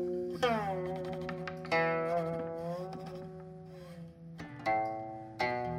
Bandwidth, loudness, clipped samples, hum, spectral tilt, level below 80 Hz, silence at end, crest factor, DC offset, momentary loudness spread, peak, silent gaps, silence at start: 15.5 kHz; -35 LUFS; under 0.1%; none; -6.5 dB/octave; -64 dBFS; 0 s; 18 dB; under 0.1%; 17 LU; -18 dBFS; none; 0 s